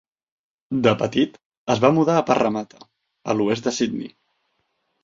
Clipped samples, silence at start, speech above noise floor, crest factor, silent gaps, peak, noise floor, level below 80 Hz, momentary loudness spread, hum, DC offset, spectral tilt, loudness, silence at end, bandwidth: under 0.1%; 0.7 s; 52 dB; 22 dB; 1.46-1.51 s, 1.57-1.66 s; 0 dBFS; -72 dBFS; -60 dBFS; 16 LU; none; under 0.1%; -5.5 dB/octave; -21 LUFS; 0.95 s; 7.8 kHz